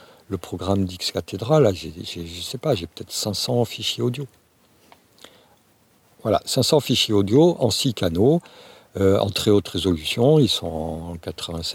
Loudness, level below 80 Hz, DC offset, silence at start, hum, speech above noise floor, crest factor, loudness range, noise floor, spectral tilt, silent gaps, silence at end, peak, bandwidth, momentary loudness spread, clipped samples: -21 LUFS; -48 dBFS; under 0.1%; 0.3 s; none; 38 dB; 18 dB; 7 LU; -59 dBFS; -5.5 dB/octave; none; 0 s; -4 dBFS; 17 kHz; 14 LU; under 0.1%